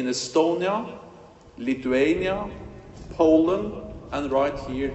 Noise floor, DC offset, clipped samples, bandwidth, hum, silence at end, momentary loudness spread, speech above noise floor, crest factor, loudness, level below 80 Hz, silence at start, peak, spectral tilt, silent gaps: -48 dBFS; under 0.1%; under 0.1%; 8.4 kHz; none; 0 s; 20 LU; 25 dB; 18 dB; -24 LUFS; -46 dBFS; 0 s; -6 dBFS; -5 dB/octave; none